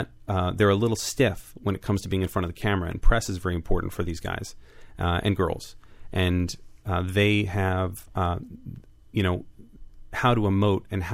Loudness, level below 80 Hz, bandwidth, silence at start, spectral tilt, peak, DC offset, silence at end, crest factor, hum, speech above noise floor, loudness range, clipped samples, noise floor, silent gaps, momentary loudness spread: -26 LUFS; -34 dBFS; 16 kHz; 0 s; -6 dB/octave; -6 dBFS; under 0.1%; 0 s; 18 dB; none; 20 dB; 3 LU; under 0.1%; -44 dBFS; none; 12 LU